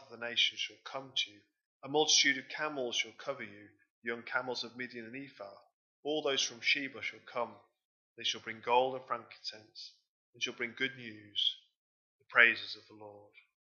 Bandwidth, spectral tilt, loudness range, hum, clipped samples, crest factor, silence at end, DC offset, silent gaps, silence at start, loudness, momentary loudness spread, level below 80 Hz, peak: 7.4 kHz; -1 dB/octave; 6 LU; none; under 0.1%; 28 dB; 0.55 s; under 0.1%; 1.66-1.80 s, 3.90-4.02 s, 5.73-6.03 s, 7.85-8.16 s, 10.08-10.33 s, 11.76-12.19 s; 0 s; -33 LUFS; 22 LU; under -90 dBFS; -8 dBFS